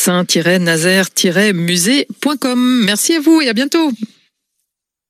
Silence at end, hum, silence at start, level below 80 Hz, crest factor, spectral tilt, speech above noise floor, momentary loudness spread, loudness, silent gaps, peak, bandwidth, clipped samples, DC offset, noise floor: 1.05 s; none; 0 s; -70 dBFS; 14 dB; -3.5 dB/octave; 61 dB; 6 LU; -13 LUFS; none; 0 dBFS; 15 kHz; under 0.1%; under 0.1%; -74 dBFS